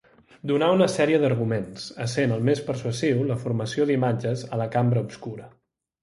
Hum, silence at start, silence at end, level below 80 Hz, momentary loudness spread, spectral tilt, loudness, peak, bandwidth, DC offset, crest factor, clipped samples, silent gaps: none; 0.45 s; 0.55 s; -60 dBFS; 13 LU; -6.5 dB/octave; -24 LUFS; -6 dBFS; 11.5 kHz; under 0.1%; 18 dB; under 0.1%; none